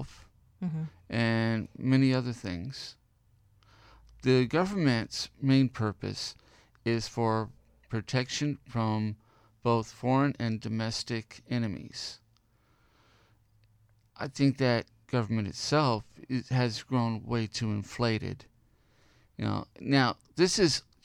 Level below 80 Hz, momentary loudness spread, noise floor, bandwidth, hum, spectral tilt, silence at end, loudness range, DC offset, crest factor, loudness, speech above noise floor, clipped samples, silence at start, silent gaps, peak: -60 dBFS; 13 LU; -67 dBFS; 11.5 kHz; none; -5.5 dB/octave; 0.25 s; 5 LU; under 0.1%; 20 dB; -30 LUFS; 38 dB; under 0.1%; 0 s; none; -12 dBFS